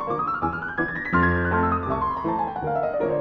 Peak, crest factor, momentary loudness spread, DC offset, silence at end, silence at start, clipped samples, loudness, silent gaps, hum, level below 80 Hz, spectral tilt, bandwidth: -8 dBFS; 16 dB; 5 LU; under 0.1%; 0 s; 0 s; under 0.1%; -24 LUFS; none; none; -42 dBFS; -9.5 dB/octave; 5.8 kHz